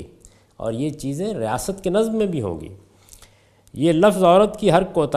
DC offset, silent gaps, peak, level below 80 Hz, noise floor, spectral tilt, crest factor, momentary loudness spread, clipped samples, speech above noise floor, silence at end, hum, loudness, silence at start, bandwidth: under 0.1%; none; 0 dBFS; -48 dBFS; -54 dBFS; -6 dB/octave; 20 dB; 15 LU; under 0.1%; 35 dB; 0 s; none; -20 LUFS; 0 s; 15 kHz